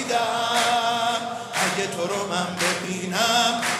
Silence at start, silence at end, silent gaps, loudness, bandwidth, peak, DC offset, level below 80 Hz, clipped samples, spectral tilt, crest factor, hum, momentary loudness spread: 0 s; 0 s; none; -23 LUFS; 15.5 kHz; -6 dBFS; under 0.1%; -70 dBFS; under 0.1%; -2.5 dB/octave; 16 dB; none; 7 LU